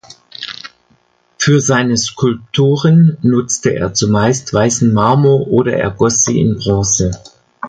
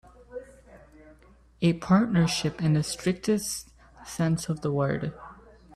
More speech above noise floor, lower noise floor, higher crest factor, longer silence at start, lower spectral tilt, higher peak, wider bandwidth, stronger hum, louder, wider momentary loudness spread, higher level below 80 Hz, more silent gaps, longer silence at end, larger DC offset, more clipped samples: first, 43 dB vs 31 dB; about the same, -55 dBFS vs -56 dBFS; about the same, 14 dB vs 18 dB; about the same, 0.4 s vs 0.3 s; about the same, -5 dB/octave vs -5.5 dB/octave; first, 0 dBFS vs -10 dBFS; second, 10 kHz vs 14.5 kHz; neither; first, -13 LUFS vs -27 LUFS; second, 8 LU vs 21 LU; first, -38 dBFS vs -54 dBFS; neither; about the same, 0 s vs 0 s; neither; neither